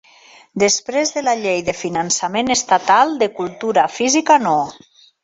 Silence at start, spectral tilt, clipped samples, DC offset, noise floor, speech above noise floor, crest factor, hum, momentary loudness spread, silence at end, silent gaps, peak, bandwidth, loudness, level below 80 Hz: 0.55 s; -2.5 dB/octave; under 0.1%; under 0.1%; -47 dBFS; 30 dB; 16 dB; none; 8 LU; 0.5 s; none; -2 dBFS; 8.4 kHz; -16 LUFS; -58 dBFS